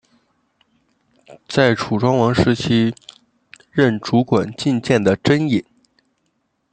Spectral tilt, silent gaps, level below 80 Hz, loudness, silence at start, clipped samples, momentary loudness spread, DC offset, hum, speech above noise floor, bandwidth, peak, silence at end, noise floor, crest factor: -6.5 dB/octave; none; -50 dBFS; -17 LUFS; 1.3 s; under 0.1%; 6 LU; under 0.1%; none; 52 dB; 9.2 kHz; 0 dBFS; 1.1 s; -68 dBFS; 20 dB